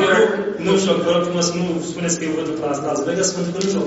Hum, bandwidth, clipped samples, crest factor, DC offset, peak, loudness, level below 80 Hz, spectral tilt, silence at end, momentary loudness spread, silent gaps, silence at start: none; 8.2 kHz; under 0.1%; 16 dB; under 0.1%; -2 dBFS; -19 LUFS; -56 dBFS; -4 dB/octave; 0 s; 6 LU; none; 0 s